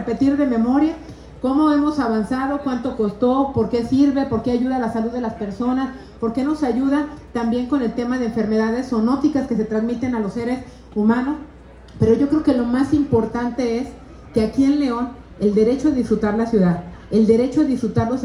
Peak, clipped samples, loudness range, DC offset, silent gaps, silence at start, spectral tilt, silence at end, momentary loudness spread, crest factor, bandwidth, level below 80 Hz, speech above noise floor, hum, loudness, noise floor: -4 dBFS; under 0.1%; 3 LU; under 0.1%; none; 0 s; -7.5 dB/octave; 0 s; 8 LU; 14 dB; 11 kHz; -44 dBFS; 22 dB; none; -20 LUFS; -40 dBFS